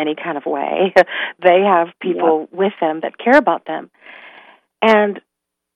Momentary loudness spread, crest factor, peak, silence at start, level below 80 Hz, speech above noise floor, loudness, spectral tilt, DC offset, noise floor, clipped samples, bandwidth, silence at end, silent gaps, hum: 9 LU; 16 dB; 0 dBFS; 0 s; -62 dBFS; 63 dB; -16 LUFS; -6 dB/octave; under 0.1%; -79 dBFS; under 0.1%; 10 kHz; 0.55 s; none; none